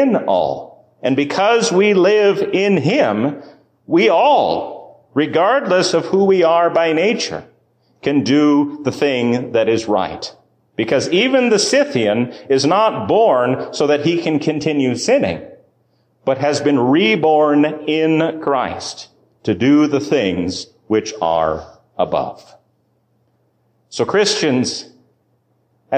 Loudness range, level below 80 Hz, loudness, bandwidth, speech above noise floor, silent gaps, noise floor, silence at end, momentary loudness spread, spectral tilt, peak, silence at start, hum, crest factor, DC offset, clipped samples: 6 LU; -52 dBFS; -16 LUFS; 10 kHz; 47 dB; none; -62 dBFS; 0 s; 11 LU; -5 dB/octave; -4 dBFS; 0 s; none; 12 dB; under 0.1%; under 0.1%